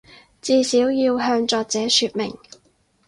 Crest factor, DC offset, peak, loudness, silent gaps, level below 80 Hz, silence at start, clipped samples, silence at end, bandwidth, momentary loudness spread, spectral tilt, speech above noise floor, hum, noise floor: 18 dB; under 0.1%; -4 dBFS; -19 LUFS; none; -60 dBFS; 0.45 s; under 0.1%; 0.7 s; 11.5 kHz; 10 LU; -2.5 dB/octave; 42 dB; none; -61 dBFS